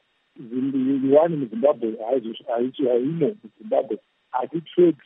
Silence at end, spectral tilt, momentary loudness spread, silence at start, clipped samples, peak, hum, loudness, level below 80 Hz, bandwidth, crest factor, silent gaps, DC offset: 0.1 s; -11.5 dB/octave; 12 LU; 0.4 s; under 0.1%; -4 dBFS; none; -23 LUFS; -80 dBFS; 3.9 kHz; 18 dB; none; under 0.1%